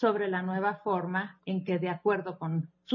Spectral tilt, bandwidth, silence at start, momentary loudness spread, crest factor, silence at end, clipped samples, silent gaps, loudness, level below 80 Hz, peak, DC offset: -9 dB/octave; 5.6 kHz; 0 s; 5 LU; 18 dB; 0 s; under 0.1%; none; -31 LUFS; -80 dBFS; -12 dBFS; under 0.1%